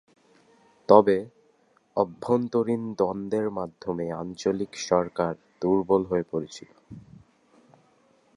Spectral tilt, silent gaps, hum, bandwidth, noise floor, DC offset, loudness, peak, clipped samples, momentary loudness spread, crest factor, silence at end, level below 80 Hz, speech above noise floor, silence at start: -6.5 dB/octave; none; none; 11 kHz; -64 dBFS; under 0.1%; -26 LUFS; -2 dBFS; under 0.1%; 21 LU; 26 dB; 1.35 s; -60 dBFS; 39 dB; 0.9 s